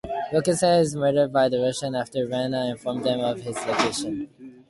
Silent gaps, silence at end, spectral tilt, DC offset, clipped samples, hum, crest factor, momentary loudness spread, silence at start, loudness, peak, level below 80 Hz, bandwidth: none; 0.15 s; -5 dB/octave; under 0.1%; under 0.1%; none; 16 dB; 9 LU; 0.05 s; -24 LUFS; -8 dBFS; -58 dBFS; 11.5 kHz